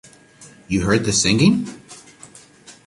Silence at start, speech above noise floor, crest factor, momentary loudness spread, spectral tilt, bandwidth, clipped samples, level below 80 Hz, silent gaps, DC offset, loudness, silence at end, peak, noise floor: 0.4 s; 29 dB; 18 dB; 22 LU; -4 dB/octave; 11.5 kHz; under 0.1%; -44 dBFS; none; under 0.1%; -17 LUFS; 0.15 s; -2 dBFS; -46 dBFS